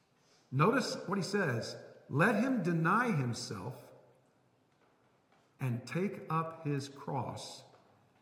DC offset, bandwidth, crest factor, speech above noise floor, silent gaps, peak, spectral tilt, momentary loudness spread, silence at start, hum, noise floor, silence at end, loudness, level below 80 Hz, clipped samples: under 0.1%; 16.5 kHz; 20 dB; 37 dB; none; -14 dBFS; -6 dB/octave; 15 LU; 0.5 s; none; -71 dBFS; 0.6 s; -34 LUFS; -80 dBFS; under 0.1%